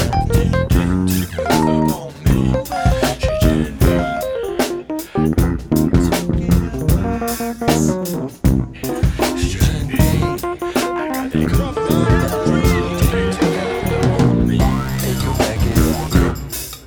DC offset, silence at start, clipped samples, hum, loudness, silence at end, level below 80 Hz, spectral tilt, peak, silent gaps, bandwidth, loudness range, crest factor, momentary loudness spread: under 0.1%; 0 s; under 0.1%; none; -17 LUFS; 0 s; -24 dBFS; -6 dB/octave; 0 dBFS; none; over 20 kHz; 2 LU; 16 dB; 5 LU